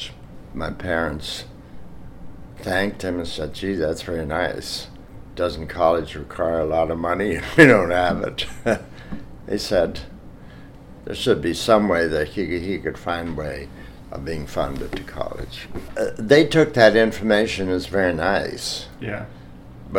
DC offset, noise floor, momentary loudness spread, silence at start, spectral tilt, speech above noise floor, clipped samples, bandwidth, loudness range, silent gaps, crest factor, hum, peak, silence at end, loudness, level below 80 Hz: under 0.1%; -41 dBFS; 19 LU; 0 s; -5 dB/octave; 20 dB; under 0.1%; 17 kHz; 9 LU; none; 22 dB; none; 0 dBFS; 0 s; -21 LUFS; -40 dBFS